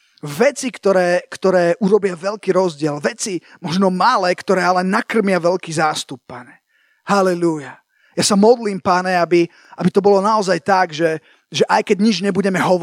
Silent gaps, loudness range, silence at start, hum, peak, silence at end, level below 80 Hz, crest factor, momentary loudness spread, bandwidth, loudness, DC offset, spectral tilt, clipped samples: none; 3 LU; 0.25 s; none; 0 dBFS; 0 s; -66 dBFS; 16 dB; 11 LU; 16 kHz; -17 LUFS; under 0.1%; -5 dB/octave; under 0.1%